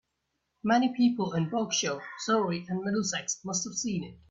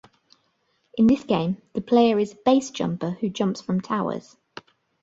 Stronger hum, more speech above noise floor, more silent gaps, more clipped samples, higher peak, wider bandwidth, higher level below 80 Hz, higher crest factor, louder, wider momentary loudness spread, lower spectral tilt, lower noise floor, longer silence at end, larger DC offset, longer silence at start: neither; first, 52 dB vs 47 dB; neither; neither; second, -12 dBFS vs -4 dBFS; about the same, 8 kHz vs 7.8 kHz; second, -68 dBFS vs -60 dBFS; about the same, 18 dB vs 18 dB; second, -29 LUFS vs -23 LUFS; second, 7 LU vs 18 LU; second, -4 dB/octave vs -6.5 dB/octave; first, -81 dBFS vs -69 dBFS; second, 0.15 s vs 0.85 s; neither; second, 0.65 s vs 0.95 s